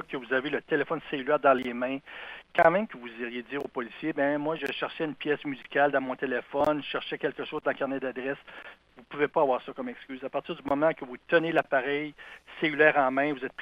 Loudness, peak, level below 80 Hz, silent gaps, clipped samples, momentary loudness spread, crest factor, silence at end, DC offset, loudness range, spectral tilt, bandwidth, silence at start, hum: -28 LUFS; -6 dBFS; -66 dBFS; none; under 0.1%; 15 LU; 22 dB; 0 s; under 0.1%; 4 LU; -6.5 dB/octave; 10.5 kHz; 0 s; none